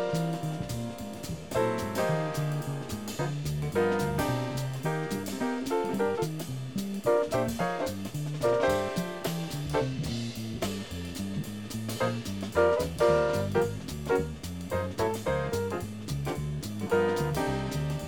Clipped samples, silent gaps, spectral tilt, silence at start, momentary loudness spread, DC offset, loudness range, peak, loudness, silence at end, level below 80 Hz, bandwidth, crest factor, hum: under 0.1%; none; -6 dB/octave; 0 s; 9 LU; 0.3%; 3 LU; -12 dBFS; -31 LUFS; 0 s; -48 dBFS; 19 kHz; 18 dB; none